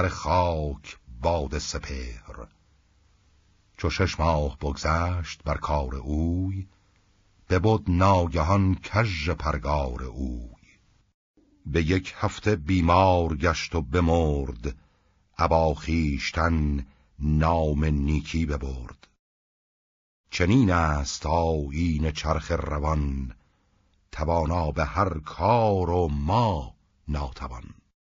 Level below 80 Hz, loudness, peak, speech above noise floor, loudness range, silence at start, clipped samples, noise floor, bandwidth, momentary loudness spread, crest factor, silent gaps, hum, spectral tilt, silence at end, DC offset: -36 dBFS; -25 LUFS; -6 dBFS; 41 dB; 5 LU; 0 s; under 0.1%; -65 dBFS; 7.6 kHz; 15 LU; 20 dB; 11.14-11.34 s, 19.19-20.24 s; none; -6 dB/octave; 0.3 s; under 0.1%